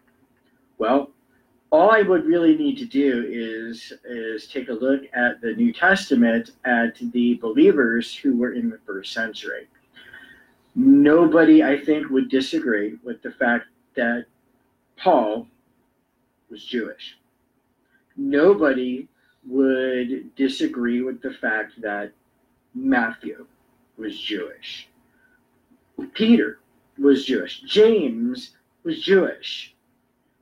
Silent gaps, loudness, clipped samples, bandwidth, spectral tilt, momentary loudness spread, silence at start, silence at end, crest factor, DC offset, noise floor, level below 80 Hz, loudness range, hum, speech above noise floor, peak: none; -20 LUFS; under 0.1%; 10.5 kHz; -5.5 dB/octave; 18 LU; 0.8 s; 0.75 s; 18 dB; under 0.1%; -68 dBFS; -64 dBFS; 9 LU; none; 48 dB; -4 dBFS